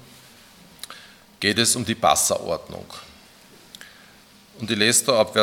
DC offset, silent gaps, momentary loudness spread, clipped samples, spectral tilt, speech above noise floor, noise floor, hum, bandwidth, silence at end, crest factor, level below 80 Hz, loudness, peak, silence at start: under 0.1%; none; 24 LU; under 0.1%; -2 dB/octave; 30 dB; -51 dBFS; none; 18 kHz; 0 s; 22 dB; -60 dBFS; -20 LUFS; -2 dBFS; 0.9 s